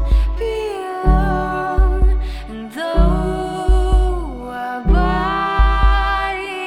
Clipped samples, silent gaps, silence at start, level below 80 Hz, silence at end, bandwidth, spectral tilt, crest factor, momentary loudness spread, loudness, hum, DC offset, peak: under 0.1%; none; 0 s; -18 dBFS; 0 s; 10 kHz; -7 dB/octave; 14 dB; 9 LU; -18 LUFS; none; under 0.1%; -2 dBFS